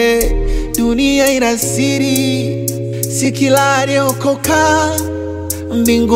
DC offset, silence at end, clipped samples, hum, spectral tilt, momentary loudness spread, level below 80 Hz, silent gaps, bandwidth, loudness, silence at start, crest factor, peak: under 0.1%; 0 s; under 0.1%; none; -4 dB/octave; 8 LU; -26 dBFS; none; 16.5 kHz; -14 LUFS; 0 s; 12 dB; 0 dBFS